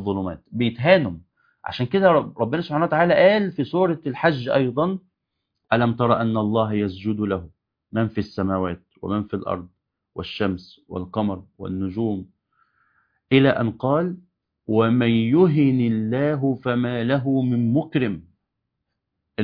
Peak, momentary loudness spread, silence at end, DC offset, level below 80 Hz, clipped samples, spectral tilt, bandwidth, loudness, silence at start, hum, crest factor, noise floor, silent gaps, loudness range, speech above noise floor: -2 dBFS; 13 LU; 0 s; under 0.1%; -56 dBFS; under 0.1%; -9.5 dB/octave; 5.2 kHz; -21 LUFS; 0 s; none; 20 dB; -79 dBFS; none; 8 LU; 58 dB